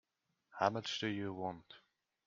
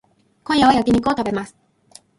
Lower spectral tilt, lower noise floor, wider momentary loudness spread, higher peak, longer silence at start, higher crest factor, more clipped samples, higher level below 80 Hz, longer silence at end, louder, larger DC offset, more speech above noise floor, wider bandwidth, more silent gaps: about the same, -4.5 dB/octave vs -5.5 dB/octave; first, -79 dBFS vs -50 dBFS; about the same, 22 LU vs 20 LU; second, -16 dBFS vs -2 dBFS; about the same, 0.55 s vs 0.5 s; first, 26 dB vs 18 dB; neither; second, -80 dBFS vs -46 dBFS; second, 0.5 s vs 0.7 s; second, -39 LUFS vs -18 LUFS; neither; first, 40 dB vs 33 dB; second, 7.6 kHz vs 11.5 kHz; neither